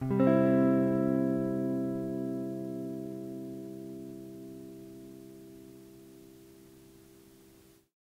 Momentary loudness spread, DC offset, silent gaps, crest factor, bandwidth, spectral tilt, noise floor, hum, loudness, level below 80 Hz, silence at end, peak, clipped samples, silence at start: 25 LU; under 0.1%; none; 18 dB; 16 kHz; -9 dB/octave; -60 dBFS; none; -31 LUFS; -68 dBFS; 1.2 s; -14 dBFS; under 0.1%; 0 s